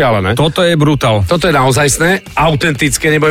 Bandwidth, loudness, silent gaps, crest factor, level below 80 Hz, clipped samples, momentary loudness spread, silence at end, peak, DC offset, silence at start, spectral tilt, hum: 16.5 kHz; -11 LUFS; none; 10 dB; -32 dBFS; under 0.1%; 2 LU; 0 s; 0 dBFS; under 0.1%; 0 s; -4.5 dB/octave; none